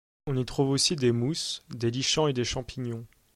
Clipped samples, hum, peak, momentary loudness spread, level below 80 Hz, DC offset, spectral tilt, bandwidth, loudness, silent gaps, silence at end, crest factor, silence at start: under 0.1%; none; -10 dBFS; 12 LU; -52 dBFS; under 0.1%; -4.5 dB/octave; 14.5 kHz; -28 LUFS; none; 0.3 s; 18 dB; 0.25 s